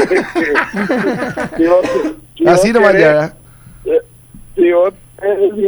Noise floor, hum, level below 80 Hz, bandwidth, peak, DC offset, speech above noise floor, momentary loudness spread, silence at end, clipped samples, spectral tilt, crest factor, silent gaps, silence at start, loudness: -38 dBFS; none; -42 dBFS; over 20 kHz; 0 dBFS; under 0.1%; 26 dB; 11 LU; 0 s; under 0.1%; -5.5 dB/octave; 12 dB; none; 0 s; -13 LUFS